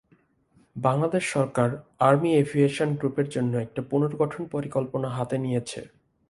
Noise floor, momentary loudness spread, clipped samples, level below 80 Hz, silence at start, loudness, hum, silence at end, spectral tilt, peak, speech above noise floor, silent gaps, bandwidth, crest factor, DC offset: -63 dBFS; 9 LU; under 0.1%; -62 dBFS; 0.75 s; -25 LUFS; none; 0.4 s; -7 dB/octave; -4 dBFS; 39 dB; none; 11.5 kHz; 22 dB; under 0.1%